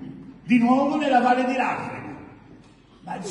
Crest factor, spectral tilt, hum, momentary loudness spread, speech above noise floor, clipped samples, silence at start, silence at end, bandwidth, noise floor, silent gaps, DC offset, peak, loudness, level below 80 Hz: 16 dB; -6 dB/octave; none; 21 LU; 30 dB; under 0.1%; 0 s; 0 s; 10.5 kHz; -50 dBFS; none; under 0.1%; -8 dBFS; -21 LUFS; -60 dBFS